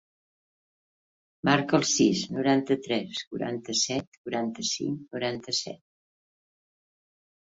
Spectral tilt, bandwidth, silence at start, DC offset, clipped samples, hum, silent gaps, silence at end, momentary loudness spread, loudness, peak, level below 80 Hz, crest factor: -3.5 dB/octave; 8 kHz; 1.45 s; under 0.1%; under 0.1%; none; 3.27-3.31 s, 4.07-4.25 s; 1.8 s; 10 LU; -27 LUFS; -6 dBFS; -66 dBFS; 24 dB